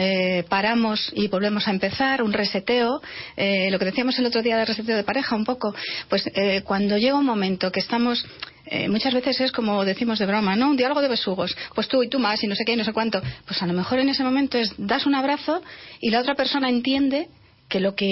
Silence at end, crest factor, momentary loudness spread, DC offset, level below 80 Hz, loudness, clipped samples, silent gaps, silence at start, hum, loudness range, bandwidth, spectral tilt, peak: 0 s; 14 dB; 6 LU; under 0.1%; -56 dBFS; -22 LUFS; under 0.1%; none; 0 s; none; 1 LU; 6 kHz; -8 dB/octave; -10 dBFS